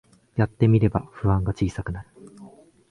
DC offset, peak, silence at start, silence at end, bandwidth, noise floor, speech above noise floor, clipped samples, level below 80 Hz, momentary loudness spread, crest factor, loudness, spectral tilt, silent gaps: under 0.1%; -6 dBFS; 0.35 s; 0.45 s; 9.8 kHz; -48 dBFS; 26 dB; under 0.1%; -40 dBFS; 14 LU; 18 dB; -24 LUFS; -9 dB/octave; none